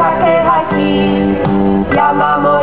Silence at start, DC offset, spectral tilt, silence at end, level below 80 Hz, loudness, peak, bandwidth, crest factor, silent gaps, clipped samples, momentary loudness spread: 0 s; 2%; -10.5 dB/octave; 0 s; -34 dBFS; -12 LUFS; 0 dBFS; 4 kHz; 10 dB; none; under 0.1%; 2 LU